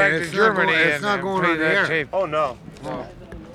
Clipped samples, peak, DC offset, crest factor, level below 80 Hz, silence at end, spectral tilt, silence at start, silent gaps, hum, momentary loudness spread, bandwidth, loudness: under 0.1%; -4 dBFS; under 0.1%; 16 dB; -50 dBFS; 0 s; -5 dB/octave; 0 s; none; none; 16 LU; 15 kHz; -19 LUFS